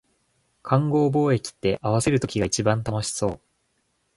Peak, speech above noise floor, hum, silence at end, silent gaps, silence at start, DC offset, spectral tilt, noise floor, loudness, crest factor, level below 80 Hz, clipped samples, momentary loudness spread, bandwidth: -4 dBFS; 48 dB; none; 0.8 s; none; 0.65 s; under 0.1%; -5.5 dB/octave; -71 dBFS; -23 LUFS; 20 dB; -48 dBFS; under 0.1%; 7 LU; 11.5 kHz